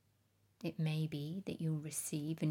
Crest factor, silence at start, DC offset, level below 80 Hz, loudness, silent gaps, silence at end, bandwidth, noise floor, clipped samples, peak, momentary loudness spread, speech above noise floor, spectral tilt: 14 dB; 0.6 s; under 0.1%; -80 dBFS; -40 LUFS; none; 0 s; 18.5 kHz; -75 dBFS; under 0.1%; -26 dBFS; 6 LU; 36 dB; -5.5 dB/octave